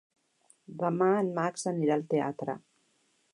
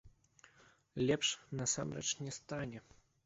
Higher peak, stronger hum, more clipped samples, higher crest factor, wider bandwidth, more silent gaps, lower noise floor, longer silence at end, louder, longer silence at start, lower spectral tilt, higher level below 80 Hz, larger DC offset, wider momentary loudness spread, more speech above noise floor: first, -14 dBFS vs -20 dBFS; neither; neither; about the same, 18 dB vs 20 dB; first, 11.5 kHz vs 8 kHz; neither; first, -71 dBFS vs -67 dBFS; first, 0.75 s vs 0.45 s; first, -30 LUFS vs -38 LUFS; first, 0.7 s vs 0.05 s; first, -6.5 dB/octave vs -4 dB/octave; second, -82 dBFS vs -68 dBFS; neither; about the same, 12 LU vs 13 LU; first, 42 dB vs 29 dB